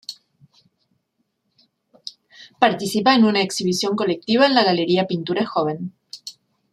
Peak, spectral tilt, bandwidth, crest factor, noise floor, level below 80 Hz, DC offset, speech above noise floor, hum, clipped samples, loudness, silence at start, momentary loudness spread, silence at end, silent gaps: 0 dBFS; -4.5 dB/octave; 14 kHz; 22 dB; -72 dBFS; -68 dBFS; under 0.1%; 54 dB; none; under 0.1%; -19 LUFS; 0.1 s; 22 LU; 0.4 s; none